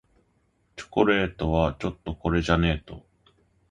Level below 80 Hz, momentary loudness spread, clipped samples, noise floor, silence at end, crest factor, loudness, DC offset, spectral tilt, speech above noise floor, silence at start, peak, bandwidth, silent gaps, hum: -38 dBFS; 22 LU; under 0.1%; -68 dBFS; 0.7 s; 22 dB; -25 LUFS; under 0.1%; -7 dB/octave; 43 dB; 0.75 s; -4 dBFS; 9.4 kHz; none; none